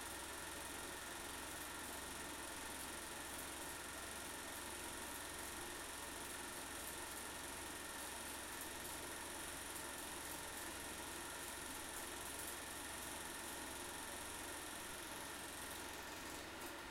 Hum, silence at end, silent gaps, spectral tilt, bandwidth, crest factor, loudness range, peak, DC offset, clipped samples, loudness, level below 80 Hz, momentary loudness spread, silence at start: none; 0 s; none; -1.5 dB/octave; 16.5 kHz; 18 dB; 0 LU; -32 dBFS; under 0.1%; under 0.1%; -48 LUFS; -66 dBFS; 1 LU; 0 s